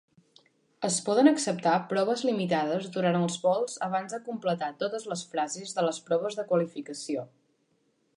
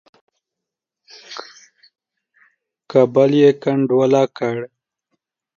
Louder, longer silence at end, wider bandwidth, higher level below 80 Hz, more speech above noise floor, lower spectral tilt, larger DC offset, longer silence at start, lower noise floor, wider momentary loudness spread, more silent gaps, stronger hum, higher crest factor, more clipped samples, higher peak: second, -28 LUFS vs -16 LUFS; about the same, 0.9 s vs 0.9 s; first, 11.5 kHz vs 7.2 kHz; second, -78 dBFS vs -70 dBFS; second, 44 dB vs 69 dB; second, -4.5 dB/octave vs -7 dB/octave; neither; second, 0.8 s vs 1.3 s; second, -71 dBFS vs -84 dBFS; second, 11 LU vs 21 LU; neither; neither; about the same, 20 dB vs 18 dB; neither; second, -8 dBFS vs -2 dBFS